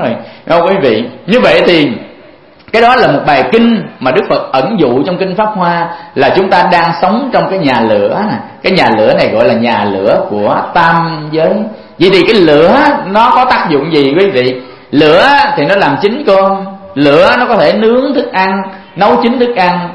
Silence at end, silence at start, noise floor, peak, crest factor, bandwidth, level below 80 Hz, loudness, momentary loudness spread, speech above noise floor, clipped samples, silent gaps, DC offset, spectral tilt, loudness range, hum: 0 s; 0 s; -37 dBFS; 0 dBFS; 8 dB; 11 kHz; -42 dBFS; -9 LUFS; 8 LU; 29 dB; 0.9%; none; under 0.1%; -6.5 dB/octave; 2 LU; none